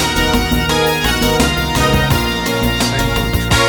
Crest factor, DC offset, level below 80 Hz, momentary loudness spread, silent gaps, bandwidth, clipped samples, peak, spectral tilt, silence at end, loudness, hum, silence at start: 14 dB; under 0.1%; -22 dBFS; 3 LU; none; over 20 kHz; under 0.1%; 0 dBFS; -4 dB/octave; 0 s; -14 LUFS; none; 0 s